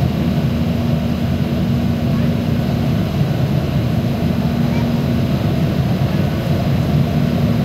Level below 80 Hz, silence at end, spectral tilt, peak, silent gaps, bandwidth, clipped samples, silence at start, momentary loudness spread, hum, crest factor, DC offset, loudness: -32 dBFS; 0 s; -8 dB/octave; -4 dBFS; none; 16 kHz; under 0.1%; 0 s; 2 LU; none; 12 dB; under 0.1%; -17 LUFS